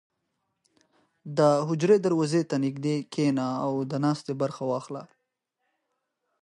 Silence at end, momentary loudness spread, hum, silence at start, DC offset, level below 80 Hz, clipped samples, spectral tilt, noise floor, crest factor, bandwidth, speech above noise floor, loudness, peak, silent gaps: 1.4 s; 9 LU; none; 1.25 s; under 0.1%; -76 dBFS; under 0.1%; -7 dB/octave; -80 dBFS; 18 dB; 11.5 kHz; 55 dB; -26 LUFS; -10 dBFS; none